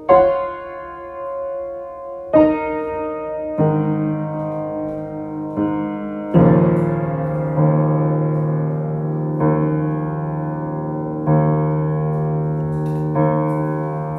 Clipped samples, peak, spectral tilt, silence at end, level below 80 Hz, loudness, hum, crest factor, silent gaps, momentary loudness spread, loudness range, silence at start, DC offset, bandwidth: under 0.1%; 0 dBFS; -11.5 dB/octave; 0 s; -46 dBFS; -19 LUFS; none; 18 dB; none; 12 LU; 4 LU; 0 s; under 0.1%; 3.3 kHz